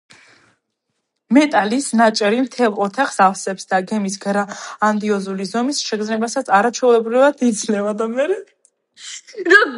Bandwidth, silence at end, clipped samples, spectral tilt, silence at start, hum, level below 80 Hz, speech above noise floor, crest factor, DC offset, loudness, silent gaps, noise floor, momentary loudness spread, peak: 11.5 kHz; 0 s; under 0.1%; -4 dB/octave; 1.3 s; none; -72 dBFS; 57 dB; 18 dB; under 0.1%; -17 LUFS; none; -74 dBFS; 9 LU; 0 dBFS